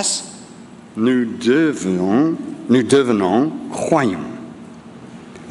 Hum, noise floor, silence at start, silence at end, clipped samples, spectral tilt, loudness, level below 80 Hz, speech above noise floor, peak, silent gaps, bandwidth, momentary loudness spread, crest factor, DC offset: none; -39 dBFS; 0 s; 0 s; under 0.1%; -5 dB/octave; -17 LUFS; -60 dBFS; 23 dB; -2 dBFS; none; 11.5 kHz; 23 LU; 18 dB; under 0.1%